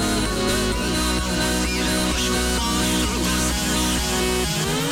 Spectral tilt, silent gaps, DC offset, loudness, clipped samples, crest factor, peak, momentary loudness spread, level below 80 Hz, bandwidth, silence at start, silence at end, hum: -3.5 dB/octave; none; under 0.1%; -21 LUFS; under 0.1%; 10 dB; -12 dBFS; 1 LU; -30 dBFS; 19.5 kHz; 0 s; 0 s; none